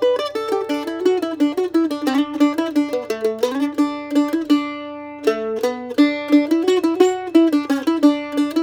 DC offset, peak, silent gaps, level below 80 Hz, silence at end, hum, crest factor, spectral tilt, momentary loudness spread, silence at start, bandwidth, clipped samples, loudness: under 0.1%; -2 dBFS; none; -64 dBFS; 0 s; none; 16 dB; -4 dB/octave; 7 LU; 0 s; 16.5 kHz; under 0.1%; -19 LUFS